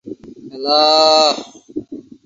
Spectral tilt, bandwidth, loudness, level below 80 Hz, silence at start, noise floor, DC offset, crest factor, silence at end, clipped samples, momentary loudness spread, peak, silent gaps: -2 dB/octave; 7.8 kHz; -12 LUFS; -60 dBFS; 0.05 s; -33 dBFS; under 0.1%; 16 dB; 0.25 s; under 0.1%; 24 LU; 0 dBFS; none